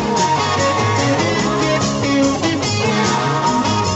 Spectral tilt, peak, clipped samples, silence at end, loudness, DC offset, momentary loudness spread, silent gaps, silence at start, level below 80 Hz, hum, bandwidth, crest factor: -4.5 dB/octave; -4 dBFS; under 0.1%; 0 s; -16 LUFS; under 0.1%; 1 LU; none; 0 s; -42 dBFS; none; 8.4 kHz; 12 dB